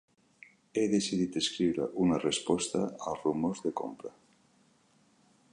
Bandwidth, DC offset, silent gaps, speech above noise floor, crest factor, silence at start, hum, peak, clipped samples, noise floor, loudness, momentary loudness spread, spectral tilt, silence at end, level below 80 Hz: 11 kHz; under 0.1%; none; 36 dB; 18 dB; 0.75 s; none; -16 dBFS; under 0.1%; -67 dBFS; -31 LUFS; 9 LU; -4.5 dB/octave; 1.45 s; -64 dBFS